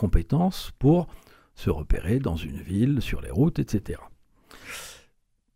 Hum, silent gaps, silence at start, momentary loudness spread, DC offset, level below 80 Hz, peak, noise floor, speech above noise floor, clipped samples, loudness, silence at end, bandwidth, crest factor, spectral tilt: none; none; 0 s; 16 LU; under 0.1%; -34 dBFS; -6 dBFS; -67 dBFS; 42 dB; under 0.1%; -26 LUFS; 0.6 s; 16 kHz; 20 dB; -7.5 dB/octave